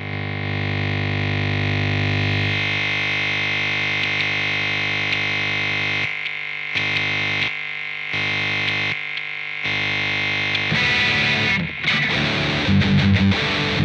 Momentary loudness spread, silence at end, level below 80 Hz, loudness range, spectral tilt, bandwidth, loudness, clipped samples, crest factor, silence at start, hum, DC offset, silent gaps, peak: 7 LU; 0 s; -46 dBFS; 4 LU; -5 dB/octave; 8.4 kHz; -19 LUFS; under 0.1%; 16 dB; 0 s; 50 Hz at -35 dBFS; under 0.1%; none; -4 dBFS